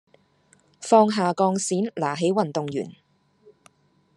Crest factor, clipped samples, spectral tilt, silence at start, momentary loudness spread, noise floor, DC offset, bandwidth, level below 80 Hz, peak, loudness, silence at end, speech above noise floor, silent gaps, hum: 22 dB; under 0.1%; -5 dB/octave; 0.8 s; 13 LU; -61 dBFS; under 0.1%; 11.5 kHz; -72 dBFS; -4 dBFS; -22 LUFS; 1.25 s; 39 dB; none; none